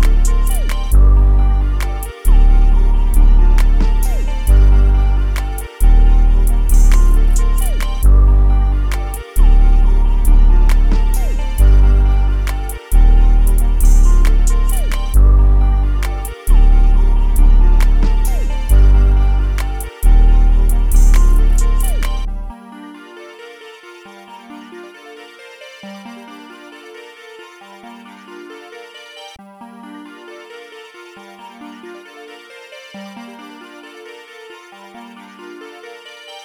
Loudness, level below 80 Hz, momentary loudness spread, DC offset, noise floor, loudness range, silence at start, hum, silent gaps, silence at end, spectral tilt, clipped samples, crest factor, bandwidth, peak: -15 LUFS; -12 dBFS; 23 LU; under 0.1%; -38 dBFS; 20 LU; 0 s; none; none; 0.05 s; -6 dB/octave; under 0.1%; 10 dB; 14 kHz; -2 dBFS